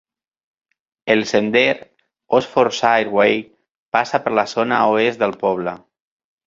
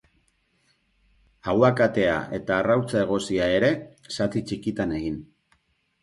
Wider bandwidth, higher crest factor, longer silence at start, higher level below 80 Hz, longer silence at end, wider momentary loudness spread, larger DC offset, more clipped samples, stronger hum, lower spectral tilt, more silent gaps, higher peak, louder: second, 7.6 kHz vs 11.5 kHz; about the same, 18 dB vs 20 dB; second, 1.05 s vs 1.45 s; second, -60 dBFS vs -52 dBFS; about the same, 0.7 s vs 0.8 s; about the same, 9 LU vs 11 LU; neither; neither; neither; second, -4.5 dB/octave vs -6 dB/octave; first, 3.70-3.92 s vs none; first, 0 dBFS vs -4 dBFS; first, -18 LUFS vs -24 LUFS